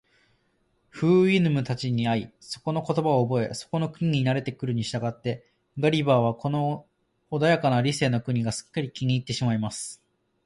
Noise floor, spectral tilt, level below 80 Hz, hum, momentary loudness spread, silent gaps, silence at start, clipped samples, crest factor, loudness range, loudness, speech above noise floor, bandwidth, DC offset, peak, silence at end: -69 dBFS; -6 dB/octave; -60 dBFS; none; 11 LU; none; 0.95 s; under 0.1%; 18 dB; 2 LU; -25 LUFS; 45 dB; 11.5 kHz; under 0.1%; -8 dBFS; 0.5 s